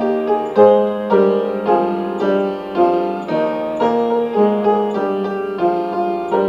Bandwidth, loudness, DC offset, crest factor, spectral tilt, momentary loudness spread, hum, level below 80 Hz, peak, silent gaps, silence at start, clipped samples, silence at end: 7.4 kHz; -17 LUFS; under 0.1%; 16 dB; -8 dB/octave; 8 LU; none; -56 dBFS; 0 dBFS; none; 0 s; under 0.1%; 0 s